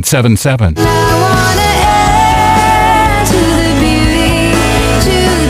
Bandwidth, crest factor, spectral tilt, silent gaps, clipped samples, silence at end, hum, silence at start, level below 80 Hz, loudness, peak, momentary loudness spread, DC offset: 16.5 kHz; 8 dB; -4.5 dB/octave; none; under 0.1%; 0 s; none; 0 s; -18 dBFS; -9 LUFS; 0 dBFS; 2 LU; under 0.1%